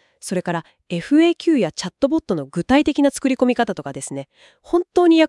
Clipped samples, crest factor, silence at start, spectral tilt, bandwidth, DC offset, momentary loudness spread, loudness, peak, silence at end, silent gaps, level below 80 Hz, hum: under 0.1%; 18 dB; 0.25 s; -5 dB/octave; 12 kHz; under 0.1%; 13 LU; -19 LUFS; -2 dBFS; 0 s; none; -52 dBFS; none